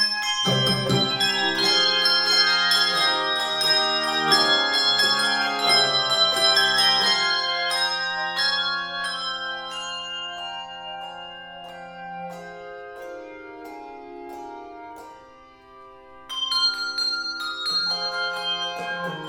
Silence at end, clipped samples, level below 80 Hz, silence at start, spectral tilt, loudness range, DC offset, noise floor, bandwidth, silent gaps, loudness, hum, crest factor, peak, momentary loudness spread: 0 s; under 0.1%; -62 dBFS; 0 s; -2 dB/octave; 20 LU; under 0.1%; -48 dBFS; 17 kHz; none; -20 LUFS; none; 18 dB; -6 dBFS; 21 LU